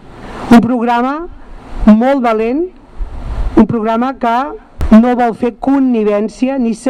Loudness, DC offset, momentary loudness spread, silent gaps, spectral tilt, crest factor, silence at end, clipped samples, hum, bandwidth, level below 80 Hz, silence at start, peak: -12 LUFS; under 0.1%; 18 LU; none; -7.5 dB/octave; 12 dB; 0 s; 0.5%; none; 10 kHz; -26 dBFS; 0.05 s; 0 dBFS